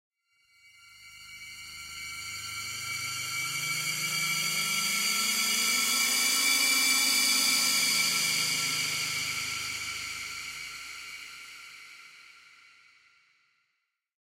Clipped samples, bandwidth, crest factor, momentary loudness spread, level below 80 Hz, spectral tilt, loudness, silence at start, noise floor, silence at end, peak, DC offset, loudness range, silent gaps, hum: under 0.1%; 16 kHz; 20 dB; 20 LU; -70 dBFS; 1 dB/octave; -26 LUFS; 0.8 s; -81 dBFS; 1.85 s; -12 dBFS; under 0.1%; 16 LU; none; none